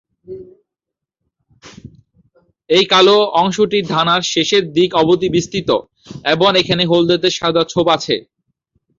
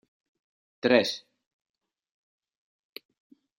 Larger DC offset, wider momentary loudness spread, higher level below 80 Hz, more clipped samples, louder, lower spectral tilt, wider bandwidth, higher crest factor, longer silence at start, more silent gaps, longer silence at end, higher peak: neither; second, 10 LU vs 24 LU; first, -52 dBFS vs -80 dBFS; neither; first, -14 LUFS vs -25 LUFS; about the same, -4.5 dB/octave vs -4 dB/octave; second, 7.6 kHz vs 15.5 kHz; second, 14 dB vs 28 dB; second, 0.3 s vs 0.85 s; neither; second, 0.8 s vs 2.4 s; first, -2 dBFS vs -6 dBFS